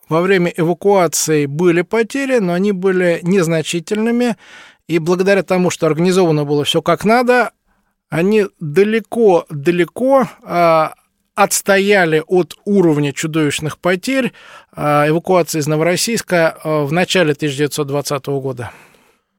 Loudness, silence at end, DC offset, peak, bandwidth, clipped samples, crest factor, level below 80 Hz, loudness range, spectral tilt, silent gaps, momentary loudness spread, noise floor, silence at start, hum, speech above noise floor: -15 LUFS; 0.65 s; under 0.1%; 0 dBFS; 17 kHz; under 0.1%; 14 dB; -56 dBFS; 2 LU; -5 dB/octave; none; 6 LU; -63 dBFS; 0.1 s; none; 48 dB